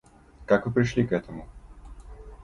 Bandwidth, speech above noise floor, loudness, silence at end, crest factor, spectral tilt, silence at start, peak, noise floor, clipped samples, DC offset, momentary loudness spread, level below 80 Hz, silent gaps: 11 kHz; 20 dB; -25 LUFS; 0.1 s; 20 dB; -7.5 dB/octave; 0.4 s; -8 dBFS; -45 dBFS; under 0.1%; under 0.1%; 24 LU; -46 dBFS; none